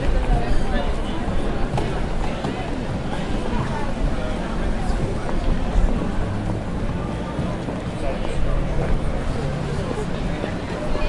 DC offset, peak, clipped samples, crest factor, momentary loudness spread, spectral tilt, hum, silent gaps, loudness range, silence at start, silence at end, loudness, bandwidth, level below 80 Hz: under 0.1%; -6 dBFS; under 0.1%; 16 dB; 3 LU; -7 dB/octave; none; none; 1 LU; 0 s; 0 s; -25 LUFS; 11 kHz; -24 dBFS